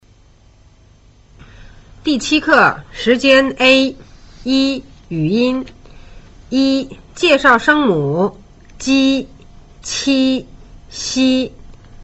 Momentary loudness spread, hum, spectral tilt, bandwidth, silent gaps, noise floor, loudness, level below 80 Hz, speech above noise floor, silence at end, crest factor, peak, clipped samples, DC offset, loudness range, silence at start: 15 LU; none; -4 dB/octave; 8.2 kHz; none; -48 dBFS; -14 LUFS; -42 dBFS; 34 dB; 0 s; 16 dB; 0 dBFS; under 0.1%; under 0.1%; 5 LU; 1.6 s